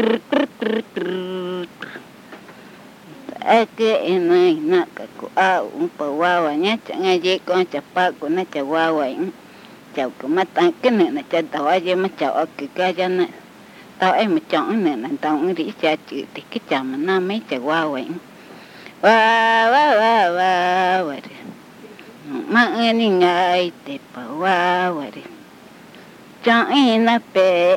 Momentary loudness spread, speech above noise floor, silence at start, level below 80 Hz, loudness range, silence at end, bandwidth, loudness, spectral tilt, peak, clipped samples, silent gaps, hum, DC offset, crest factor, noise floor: 16 LU; 25 dB; 0 s; -72 dBFS; 6 LU; 0 s; 16 kHz; -18 LUFS; -5 dB/octave; -2 dBFS; under 0.1%; none; none; under 0.1%; 18 dB; -43 dBFS